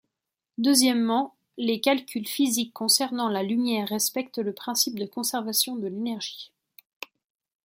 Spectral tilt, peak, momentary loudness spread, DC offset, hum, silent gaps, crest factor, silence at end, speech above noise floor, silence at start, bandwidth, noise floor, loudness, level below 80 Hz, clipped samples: -2.5 dB/octave; -4 dBFS; 16 LU; under 0.1%; none; none; 22 dB; 1.2 s; 61 dB; 0.6 s; 16.5 kHz; -86 dBFS; -25 LUFS; -78 dBFS; under 0.1%